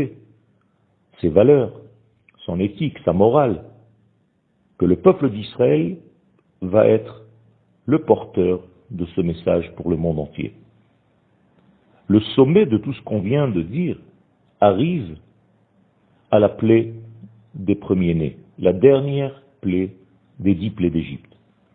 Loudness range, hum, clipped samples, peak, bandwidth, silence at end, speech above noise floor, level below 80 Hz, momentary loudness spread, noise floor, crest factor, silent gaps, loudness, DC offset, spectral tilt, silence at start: 3 LU; none; under 0.1%; 0 dBFS; 4.4 kHz; 0.6 s; 46 dB; -48 dBFS; 15 LU; -63 dBFS; 20 dB; none; -19 LUFS; under 0.1%; -12 dB/octave; 0 s